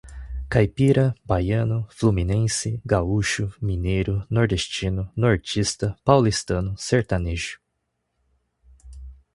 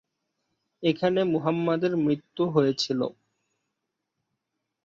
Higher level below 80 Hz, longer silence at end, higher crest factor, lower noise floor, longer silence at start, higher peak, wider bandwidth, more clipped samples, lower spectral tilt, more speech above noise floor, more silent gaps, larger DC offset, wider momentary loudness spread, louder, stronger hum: first, -36 dBFS vs -70 dBFS; second, 0.2 s vs 1.75 s; about the same, 22 dB vs 18 dB; second, -76 dBFS vs -83 dBFS; second, 0.05 s vs 0.8 s; first, 0 dBFS vs -10 dBFS; first, 11.5 kHz vs 7.8 kHz; neither; about the same, -5.5 dB/octave vs -6.5 dB/octave; second, 54 dB vs 58 dB; neither; neither; first, 8 LU vs 5 LU; first, -23 LUFS vs -26 LUFS; neither